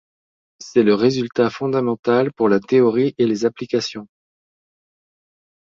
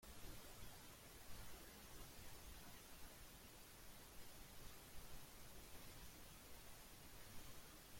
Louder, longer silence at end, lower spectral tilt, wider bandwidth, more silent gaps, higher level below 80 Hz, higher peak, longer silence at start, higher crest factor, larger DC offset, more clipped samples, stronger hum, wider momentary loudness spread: first, -18 LUFS vs -60 LUFS; first, 1.7 s vs 0 s; first, -6 dB/octave vs -3 dB/octave; second, 7.6 kHz vs 16.5 kHz; first, 1.99-2.03 s vs none; about the same, -62 dBFS vs -66 dBFS; first, -2 dBFS vs -42 dBFS; first, 0.6 s vs 0 s; about the same, 18 dB vs 16 dB; neither; neither; neither; first, 7 LU vs 2 LU